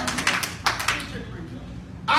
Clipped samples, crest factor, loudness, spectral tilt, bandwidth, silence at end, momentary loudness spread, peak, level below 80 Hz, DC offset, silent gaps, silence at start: under 0.1%; 24 dB; -25 LUFS; -2.5 dB/octave; 16.5 kHz; 0 s; 15 LU; -4 dBFS; -44 dBFS; under 0.1%; none; 0 s